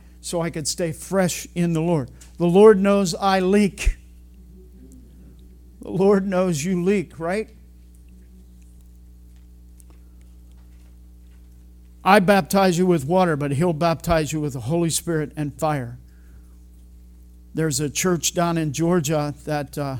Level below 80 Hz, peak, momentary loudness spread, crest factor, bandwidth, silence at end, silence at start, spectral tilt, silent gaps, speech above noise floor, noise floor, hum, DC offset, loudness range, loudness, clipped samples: -40 dBFS; 0 dBFS; 11 LU; 22 dB; 18 kHz; 0 s; 0.25 s; -5.5 dB/octave; none; 26 dB; -46 dBFS; 60 Hz at -45 dBFS; under 0.1%; 8 LU; -21 LUFS; under 0.1%